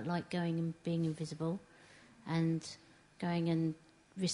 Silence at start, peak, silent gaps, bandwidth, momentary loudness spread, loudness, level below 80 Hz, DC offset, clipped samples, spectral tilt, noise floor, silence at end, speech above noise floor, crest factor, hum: 0 s; -22 dBFS; none; 10.5 kHz; 16 LU; -37 LUFS; -74 dBFS; under 0.1%; under 0.1%; -6 dB/octave; -61 dBFS; 0 s; 25 dB; 16 dB; none